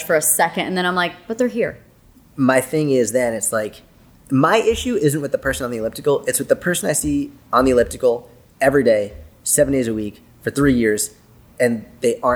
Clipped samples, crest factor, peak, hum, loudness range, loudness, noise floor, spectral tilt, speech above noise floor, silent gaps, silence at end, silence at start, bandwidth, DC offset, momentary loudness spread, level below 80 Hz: under 0.1%; 18 dB; -2 dBFS; none; 2 LU; -19 LUFS; -50 dBFS; -4 dB/octave; 32 dB; none; 0 s; 0 s; over 20 kHz; under 0.1%; 9 LU; -42 dBFS